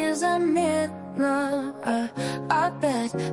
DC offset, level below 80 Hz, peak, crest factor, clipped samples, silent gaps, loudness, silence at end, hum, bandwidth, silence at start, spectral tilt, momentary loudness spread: under 0.1%; -66 dBFS; -10 dBFS; 16 dB; under 0.1%; none; -25 LUFS; 0 s; none; 11.5 kHz; 0 s; -5 dB/octave; 6 LU